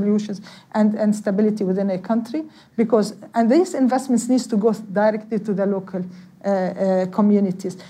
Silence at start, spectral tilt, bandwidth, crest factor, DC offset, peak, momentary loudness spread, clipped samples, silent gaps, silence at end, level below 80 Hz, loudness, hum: 0 s; -7 dB/octave; 12.5 kHz; 14 dB; under 0.1%; -6 dBFS; 12 LU; under 0.1%; none; 0 s; -70 dBFS; -20 LUFS; none